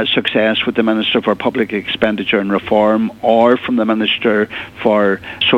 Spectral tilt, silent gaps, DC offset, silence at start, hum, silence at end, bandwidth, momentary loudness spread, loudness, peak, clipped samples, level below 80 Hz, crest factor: -6.5 dB/octave; none; under 0.1%; 0 s; none; 0 s; 7.8 kHz; 5 LU; -15 LUFS; 0 dBFS; under 0.1%; -50 dBFS; 14 dB